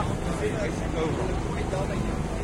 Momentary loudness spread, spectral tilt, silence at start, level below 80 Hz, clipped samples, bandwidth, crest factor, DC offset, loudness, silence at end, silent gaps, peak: 2 LU; -6.5 dB/octave; 0 s; -34 dBFS; under 0.1%; 15.5 kHz; 14 dB; under 0.1%; -29 LUFS; 0 s; none; -14 dBFS